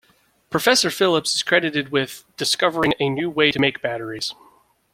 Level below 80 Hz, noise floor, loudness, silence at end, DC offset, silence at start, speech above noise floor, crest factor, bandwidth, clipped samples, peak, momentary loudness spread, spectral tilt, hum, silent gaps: -56 dBFS; -58 dBFS; -20 LUFS; 0.6 s; under 0.1%; 0.5 s; 38 dB; 20 dB; 16.5 kHz; under 0.1%; -2 dBFS; 10 LU; -3 dB/octave; none; none